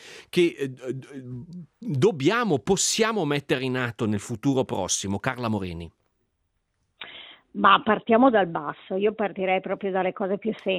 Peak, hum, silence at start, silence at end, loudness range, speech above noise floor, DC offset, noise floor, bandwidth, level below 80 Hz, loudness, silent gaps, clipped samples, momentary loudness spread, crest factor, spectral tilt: -4 dBFS; none; 0 s; 0 s; 6 LU; 50 dB; under 0.1%; -75 dBFS; 15.5 kHz; -62 dBFS; -24 LUFS; none; under 0.1%; 20 LU; 20 dB; -4.5 dB/octave